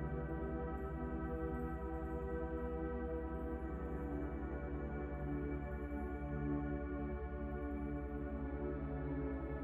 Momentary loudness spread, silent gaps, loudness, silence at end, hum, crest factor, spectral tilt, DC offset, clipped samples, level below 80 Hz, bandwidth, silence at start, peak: 2 LU; none; -43 LUFS; 0 s; none; 14 dB; -10.5 dB/octave; under 0.1%; under 0.1%; -46 dBFS; 3.5 kHz; 0 s; -28 dBFS